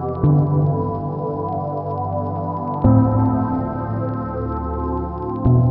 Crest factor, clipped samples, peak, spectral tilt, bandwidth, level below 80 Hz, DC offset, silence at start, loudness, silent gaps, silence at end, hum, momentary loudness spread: 16 dB; under 0.1%; -2 dBFS; -12 dB/octave; 2.5 kHz; -34 dBFS; under 0.1%; 0 s; -20 LUFS; none; 0 s; none; 9 LU